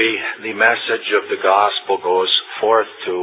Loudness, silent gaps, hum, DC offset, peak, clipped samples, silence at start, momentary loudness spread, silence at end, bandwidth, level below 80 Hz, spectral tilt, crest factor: -17 LUFS; none; none; under 0.1%; 0 dBFS; under 0.1%; 0 s; 6 LU; 0 s; 4 kHz; -70 dBFS; -6 dB/octave; 16 dB